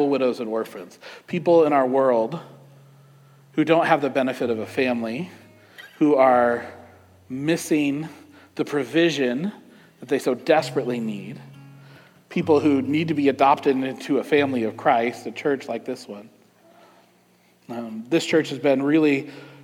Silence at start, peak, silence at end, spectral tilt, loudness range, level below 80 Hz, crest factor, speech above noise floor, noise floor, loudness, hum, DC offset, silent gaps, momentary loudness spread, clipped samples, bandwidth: 0 s; -4 dBFS; 0.1 s; -6 dB/octave; 5 LU; -74 dBFS; 18 dB; 37 dB; -59 dBFS; -22 LUFS; 60 Hz at -60 dBFS; under 0.1%; none; 17 LU; under 0.1%; 16 kHz